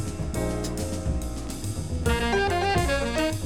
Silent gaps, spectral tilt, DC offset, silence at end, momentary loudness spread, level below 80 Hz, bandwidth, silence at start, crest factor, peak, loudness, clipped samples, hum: none; -5 dB/octave; under 0.1%; 0 s; 9 LU; -32 dBFS; 17.5 kHz; 0 s; 16 dB; -10 dBFS; -27 LUFS; under 0.1%; none